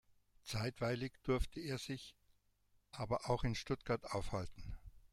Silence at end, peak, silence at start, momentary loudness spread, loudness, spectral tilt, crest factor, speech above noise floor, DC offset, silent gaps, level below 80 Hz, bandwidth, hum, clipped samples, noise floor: 0.05 s; -24 dBFS; 0.45 s; 16 LU; -42 LUFS; -5.5 dB/octave; 18 dB; 35 dB; under 0.1%; none; -52 dBFS; 15.5 kHz; 50 Hz at -70 dBFS; under 0.1%; -76 dBFS